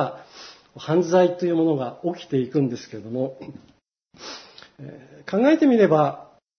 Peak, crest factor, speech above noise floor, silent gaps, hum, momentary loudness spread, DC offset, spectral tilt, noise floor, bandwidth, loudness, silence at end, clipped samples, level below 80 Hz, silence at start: -4 dBFS; 18 dB; 24 dB; none; none; 25 LU; under 0.1%; -7 dB/octave; -46 dBFS; 6.6 kHz; -21 LUFS; 0.35 s; under 0.1%; -68 dBFS; 0 s